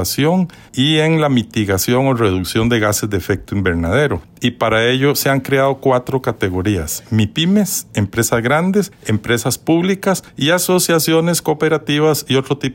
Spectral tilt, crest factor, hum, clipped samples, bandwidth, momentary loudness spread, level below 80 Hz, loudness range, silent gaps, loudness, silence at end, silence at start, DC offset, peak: -4.5 dB/octave; 12 dB; none; under 0.1%; 16.5 kHz; 6 LU; -44 dBFS; 1 LU; none; -16 LUFS; 0 s; 0 s; under 0.1%; -4 dBFS